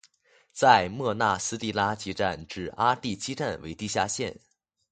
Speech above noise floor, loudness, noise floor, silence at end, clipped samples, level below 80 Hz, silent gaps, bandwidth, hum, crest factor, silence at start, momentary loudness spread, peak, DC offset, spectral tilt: 36 dB; -27 LUFS; -63 dBFS; 0.6 s; under 0.1%; -56 dBFS; none; 9.4 kHz; none; 22 dB; 0.55 s; 15 LU; -4 dBFS; under 0.1%; -3.5 dB/octave